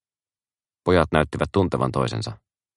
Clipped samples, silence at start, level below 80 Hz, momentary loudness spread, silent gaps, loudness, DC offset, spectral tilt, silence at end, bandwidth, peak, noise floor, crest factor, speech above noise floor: under 0.1%; 0.85 s; -42 dBFS; 11 LU; none; -22 LUFS; under 0.1%; -6.5 dB/octave; 0.4 s; 11.5 kHz; 0 dBFS; under -90 dBFS; 24 dB; over 69 dB